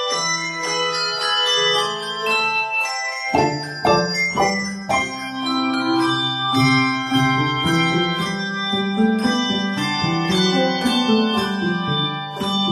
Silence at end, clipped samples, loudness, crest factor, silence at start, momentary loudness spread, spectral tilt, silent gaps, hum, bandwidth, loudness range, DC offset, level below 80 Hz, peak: 0 s; under 0.1%; -19 LUFS; 16 dB; 0 s; 6 LU; -4 dB/octave; none; none; 13.5 kHz; 1 LU; under 0.1%; -52 dBFS; -4 dBFS